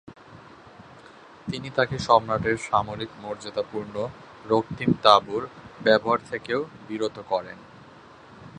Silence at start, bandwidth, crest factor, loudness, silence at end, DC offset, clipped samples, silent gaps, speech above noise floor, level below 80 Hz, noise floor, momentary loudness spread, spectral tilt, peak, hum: 0.05 s; 11 kHz; 26 dB; -25 LUFS; 0 s; under 0.1%; under 0.1%; none; 24 dB; -56 dBFS; -48 dBFS; 15 LU; -5.5 dB/octave; 0 dBFS; none